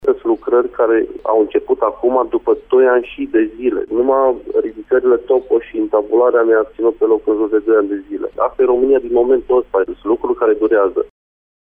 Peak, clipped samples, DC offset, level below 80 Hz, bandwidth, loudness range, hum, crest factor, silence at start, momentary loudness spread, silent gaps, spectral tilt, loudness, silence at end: -4 dBFS; under 0.1%; under 0.1%; -48 dBFS; 3.6 kHz; 1 LU; none; 12 dB; 0.05 s; 6 LU; none; -8.5 dB/octave; -15 LUFS; 0.75 s